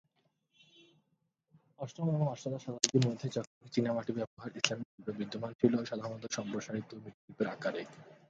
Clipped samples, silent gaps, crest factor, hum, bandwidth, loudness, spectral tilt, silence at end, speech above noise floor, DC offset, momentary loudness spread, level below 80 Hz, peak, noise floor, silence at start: under 0.1%; 3.47-3.61 s, 4.27-4.37 s, 4.85-4.98 s, 5.55-5.59 s, 7.14-7.28 s; 32 dB; none; 9 kHz; -35 LUFS; -4.5 dB/octave; 0.15 s; 44 dB; under 0.1%; 13 LU; -74 dBFS; -4 dBFS; -80 dBFS; 1.8 s